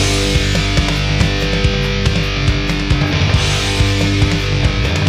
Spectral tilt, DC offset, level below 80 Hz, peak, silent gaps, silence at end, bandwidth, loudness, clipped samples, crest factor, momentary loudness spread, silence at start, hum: -4.5 dB/octave; under 0.1%; -20 dBFS; 0 dBFS; none; 0 s; 15 kHz; -15 LUFS; under 0.1%; 14 dB; 2 LU; 0 s; none